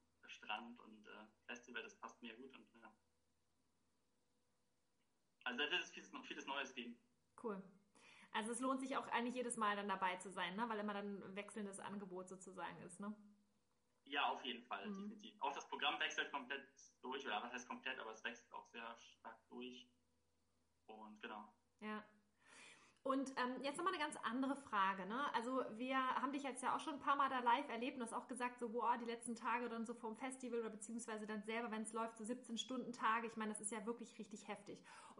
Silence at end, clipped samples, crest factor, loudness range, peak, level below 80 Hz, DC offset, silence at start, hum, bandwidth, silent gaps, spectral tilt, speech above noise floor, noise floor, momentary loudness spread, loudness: 0.05 s; under 0.1%; 22 dB; 15 LU; -26 dBFS; under -90 dBFS; under 0.1%; 0.25 s; none; 10.5 kHz; none; -3 dB/octave; 41 dB; -87 dBFS; 16 LU; -45 LUFS